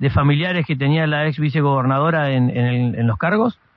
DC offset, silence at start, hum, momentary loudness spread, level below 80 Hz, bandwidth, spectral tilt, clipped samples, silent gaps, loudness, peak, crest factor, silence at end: under 0.1%; 0 s; none; 3 LU; -44 dBFS; 5.2 kHz; -10 dB/octave; under 0.1%; none; -18 LUFS; -4 dBFS; 12 dB; 0.25 s